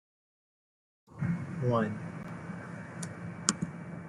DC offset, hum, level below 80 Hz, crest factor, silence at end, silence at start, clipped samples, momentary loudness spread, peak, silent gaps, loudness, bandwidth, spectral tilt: under 0.1%; none; -66 dBFS; 36 dB; 0 s; 1.1 s; under 0.1%; 12 LU; 0 dBFS; none; -35 LUFS; 12 kHz; -4.5 dB/octave